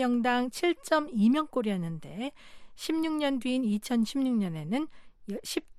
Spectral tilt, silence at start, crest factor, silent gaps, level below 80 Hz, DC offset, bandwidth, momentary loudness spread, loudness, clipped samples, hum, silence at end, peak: -5.5 dB/octave; 0 s; 16 dB; none; -62 dBFS; under 0.1%; 14.5 kHz; 13 LU; -30 LUFS; under 0.1%; none; 0 s; -14 dBFS